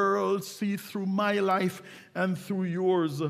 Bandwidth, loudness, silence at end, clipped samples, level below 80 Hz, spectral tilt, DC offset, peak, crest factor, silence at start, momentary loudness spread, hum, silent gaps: 15.5 kHz; -29 LUFS; 0 s; under 0.1%; -76 dBFS; -6 dB/octave; under 0.1%; -14 dBFS; 14 dB; 0 s; 7 LU; none; none